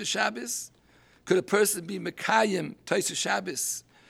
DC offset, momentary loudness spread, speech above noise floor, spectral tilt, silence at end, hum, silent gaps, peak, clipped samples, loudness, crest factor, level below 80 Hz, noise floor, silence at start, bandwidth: under 0.1%; 9 LU; 32 dB; -2.5 dB/octave; 0.3 s; none; none; -8 dBFS; under 0.1%; -27 LUFS; 20 dB; -72 dBFS; -60 dBFS; 0 s; 17 kHz